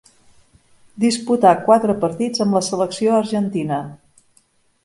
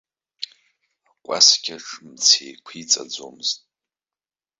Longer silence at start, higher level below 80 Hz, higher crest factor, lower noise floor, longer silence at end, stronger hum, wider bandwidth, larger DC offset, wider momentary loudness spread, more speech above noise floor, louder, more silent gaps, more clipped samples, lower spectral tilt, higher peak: first, 0.95 s vs 0.4 s; first, -60 dBFS vs -78 dBFS; about the same, 18 dB vs 22 dB; second, -59 dBFS vs under -90 dBFS; second, 0.9 s vs 1.05 s; neither; first, 11.5 kHz vs 8.4 kHz; neither; second, 8 LU vs 22 LU; second, 42 dB vs over 69 dB; about the same, -18 LUFS vs -17 LUFS; neither; neither; first, -5.5 dB/octave vs 1.5 dB/octave; about the same, 0 dBFS vs -2 dBFS